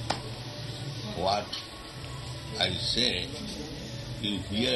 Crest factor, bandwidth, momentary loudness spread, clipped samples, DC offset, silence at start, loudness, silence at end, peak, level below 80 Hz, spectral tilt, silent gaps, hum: 22 dB; 12 kHz; 13 LU; under 0.1%; under 0.1%; 0 s; -32 LUFS; 0 s; -10 dBFS; -50 dBFS; -4 dB/octave; none; none